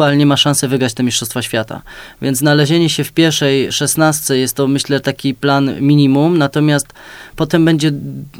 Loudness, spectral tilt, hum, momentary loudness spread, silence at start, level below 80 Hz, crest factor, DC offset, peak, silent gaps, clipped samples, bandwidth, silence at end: -13 LUFS; -4.5 dB/octave; none; 9 LU; 0 s; -48 dBFS; 14 dB; under 0.1%; 0 dBFS; none; under 0.1%; over 20 kHz; 0 s